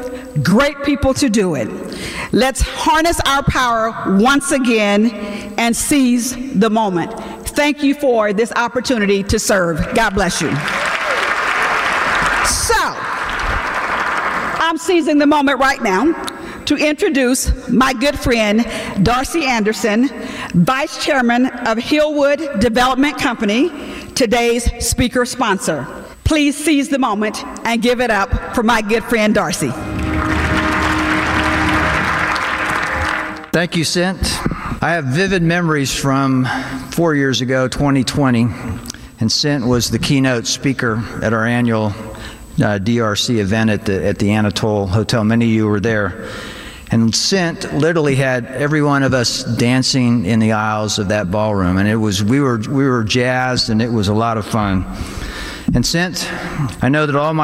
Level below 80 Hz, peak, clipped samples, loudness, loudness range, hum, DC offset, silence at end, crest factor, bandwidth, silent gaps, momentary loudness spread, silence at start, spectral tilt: -32 dBFS; -4 dBFS; under 0.1%; -16 LUFS; 2 LU; none; under 0.1%; 0 s; 12 dB; 16 kHz; none; 7 LU; 0 s; -4.5 dB/octave